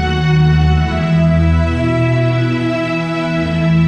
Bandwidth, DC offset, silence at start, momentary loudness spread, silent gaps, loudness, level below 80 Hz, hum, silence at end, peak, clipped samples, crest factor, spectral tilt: 8.4 kHz; under 0.1%; 0 s; 5 LU; none; -14 LUFS; -24 dBFS; none; 0 s; -2 dBFS; under 0.1%; 10 dB; -8 dB/octave